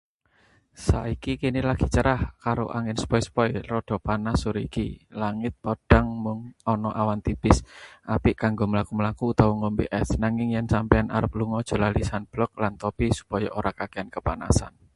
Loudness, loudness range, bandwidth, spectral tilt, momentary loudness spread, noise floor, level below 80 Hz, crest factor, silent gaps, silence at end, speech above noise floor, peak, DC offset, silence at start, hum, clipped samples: -26 LUFS; 3 LU; 11.5 kHz; -6.5 dB/octave; 8 LU; -63 dBFS; -34 dBFS; 24 dB; none; 0.25 s; 38 dB; 0 dBFS; under 0.1%; 0.8 s; none; under 0.1%